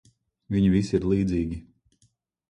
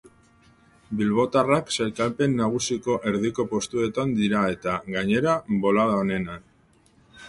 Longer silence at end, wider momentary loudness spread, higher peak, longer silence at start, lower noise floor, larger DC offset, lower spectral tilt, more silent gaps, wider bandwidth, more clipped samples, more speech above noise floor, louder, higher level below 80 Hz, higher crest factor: first, 0.9 s vs 0 s; first, 10 LU vs 6 LU; about the same, -10 dBFS vs -8 dBFS; second, 0.5 s vs 0.9 s; first, -68 dBFS vs -59 dBFS; neither; first, -8 dB/octave vs -5.5 dB/octave; neither; second, 9.6 kHz vs 11.5 kHz; neither; first, 44 dB vs 35 dB; about the same, -25 LUFS vs -24 LUFS; first, -44 dBFS vs -54 dBFS; about the same, 16 dB vs 16 dB